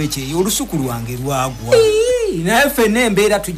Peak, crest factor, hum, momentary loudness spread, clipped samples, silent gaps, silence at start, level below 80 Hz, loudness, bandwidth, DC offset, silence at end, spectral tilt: -2 dBFS; 14 dB; none; 8 LU; under 0.1%; none; 0 s; -36 dBFS; -15 LUFS; 16 kHz; under 0.1%; 0 s; -4 dB/octave